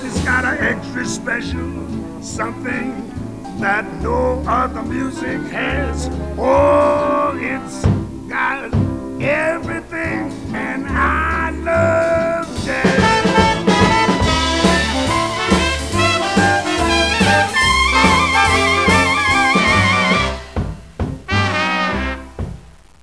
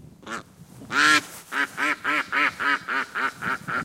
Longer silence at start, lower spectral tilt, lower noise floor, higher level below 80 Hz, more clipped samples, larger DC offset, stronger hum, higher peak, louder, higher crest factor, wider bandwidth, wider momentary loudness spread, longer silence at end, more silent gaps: about the same, 0 s vs 0 s; first, -4.5 dB/octave vs -1.5 dB/octave; second, -38 dBFS vs -45 dBFS; first, -30 dBFS vs -64 dBFS; neither; first, 0.4% vs under 0.1%; neither; first, 0 dBFS vs -4 dBFS; first, -16 LUFS vs -23 LUFS; second, 16 dB vs 22 dB; second, 11 kHz vs 16.5 kHz; second, 12 LU vs 17 LU; first, 0.3 s vs 0 s; neither